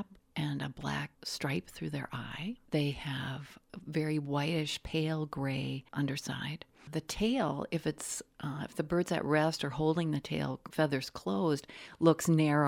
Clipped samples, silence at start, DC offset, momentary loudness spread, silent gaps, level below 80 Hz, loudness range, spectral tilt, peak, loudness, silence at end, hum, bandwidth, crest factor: under 0.1%; 0 s; under 0.1%; 11 LU; none; -60 dBFS; 5 LU; -5.5 dB/octave; -12 dBFS; -34 LUFS; 0 s; none; 16.5 kHz; 20 dB